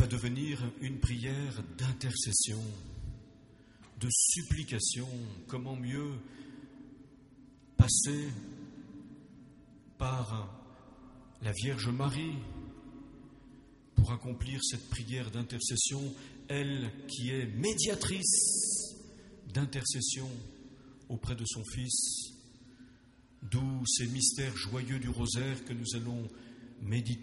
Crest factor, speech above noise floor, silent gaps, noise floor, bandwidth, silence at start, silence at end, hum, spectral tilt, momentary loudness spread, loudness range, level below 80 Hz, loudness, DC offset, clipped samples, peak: 26 dB; 27 dB; none; -61 dBFS; 11.5 kHz; 0 s; 0 s; none; -3.5 dB/octave; 23 LU; 7 LU; -50 dBFS; -33 LUFS; under 0.1%; under 0.1%; -10 dBFS